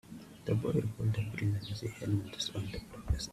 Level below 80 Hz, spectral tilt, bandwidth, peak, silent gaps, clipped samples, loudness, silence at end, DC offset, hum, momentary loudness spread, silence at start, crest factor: -46 dBFS; -6 dB/octave; 14 kHz; -18 dBFS; none; under 0.1%; -36 LUFS; 0 s; under 0.1%; none; 10 LU; 0.05 s; 16 dB